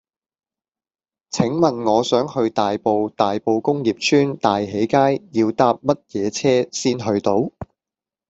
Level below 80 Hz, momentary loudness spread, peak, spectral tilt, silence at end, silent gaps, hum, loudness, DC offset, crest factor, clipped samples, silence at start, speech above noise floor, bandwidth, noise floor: -58 dBFS; 5 LU; -2 dBFS; -5.5 dB/octave; 0.65 s; none; none; -19 LUFS; under 0.1%; 18 dB; under 0.1%; 1.35 s; over 71 dB; 8 kHz; under -90 dBFS